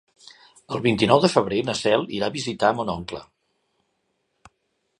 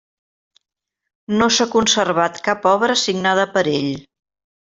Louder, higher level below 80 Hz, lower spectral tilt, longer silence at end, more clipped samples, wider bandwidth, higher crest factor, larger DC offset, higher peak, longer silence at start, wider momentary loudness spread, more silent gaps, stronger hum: second, -22 LUFS vs -17 LUFS; about the same, -56 dBFS vs -56 dBFS; first, -5 dB/octave vs -3 dB/octave; first, 1.75 s vs 0.65 s; neither; first, 11.5 kHz vs 8.2 kHz; first, 24 dB vs 16 dB; neither; about the same, -2 dBFS vs -2 dBFS; second, 0.7 s vs 1.3 s; first, 14 LU vs 7 LU; neither; neither